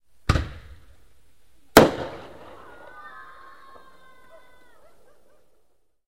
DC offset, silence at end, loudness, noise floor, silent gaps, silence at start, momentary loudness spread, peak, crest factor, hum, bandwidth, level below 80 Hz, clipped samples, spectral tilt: 0.4%; 3.9 s; -20 LUFS; -65 dBFS; none; 0.3 s; 29 LU; 0 dBFS; 28 dB; none; 16 kHz; -40 dBFS; under 0.1%; -4.5 dB/octave